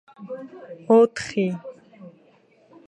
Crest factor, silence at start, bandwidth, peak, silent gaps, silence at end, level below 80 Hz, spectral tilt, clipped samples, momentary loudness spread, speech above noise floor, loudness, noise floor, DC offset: 18 dB; 0.2 s; 9.8 kHz; -6 dBFS; none; 0.8 s; -66 dBFS; -6 dB/octave; under 0.1%; 23 LU; 36 dB; -20 LUFS; -57 dBFS; under 0.1%